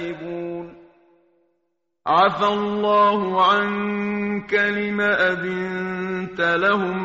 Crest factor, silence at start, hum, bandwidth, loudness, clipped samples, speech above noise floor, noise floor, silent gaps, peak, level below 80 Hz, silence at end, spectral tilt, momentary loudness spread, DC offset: 18 dB; 0 s; none; 7.6 kHz; -20 LUFS; under 0.1%; 54 dB; -74 dBFS; none; -4 dBFS; -58 dBFS; 0 s; -3 dB/octave; 13 LU; under 0.1%